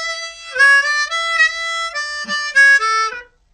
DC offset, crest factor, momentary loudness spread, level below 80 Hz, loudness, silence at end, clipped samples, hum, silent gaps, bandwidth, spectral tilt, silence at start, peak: under 0.1%; 14 dB; 13 LU; -56 dBFS; -14 LUFS; 0.3 s; under 0.1%; none; none; 11 kHz; 1.5 dB/octave; 0 s; -2 dBFS